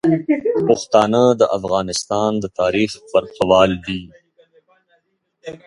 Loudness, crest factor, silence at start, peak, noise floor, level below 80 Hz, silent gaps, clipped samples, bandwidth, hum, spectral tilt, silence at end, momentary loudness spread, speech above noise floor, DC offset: -17 LUFS; 18 dB; 0.05 s; 0 dBFS; -64 dBFS; -48 dBFS; none; under 0.1%; 11.5 kHz; none; -5 dB/octave; 0.1 s; 11 LU; 48 dB; under 0.1%